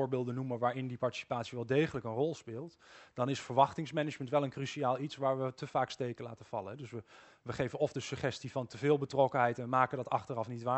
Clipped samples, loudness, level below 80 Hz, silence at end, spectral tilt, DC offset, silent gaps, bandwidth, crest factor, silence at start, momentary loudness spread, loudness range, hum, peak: under 0.1%; -35 LUFS; -70 dBFS; 0 s; -6 dB/octave; under 0.1%; none; 8.2 kHz; 22 dB; 0 s; 14 LU; 4 LU; none; -12 dBFS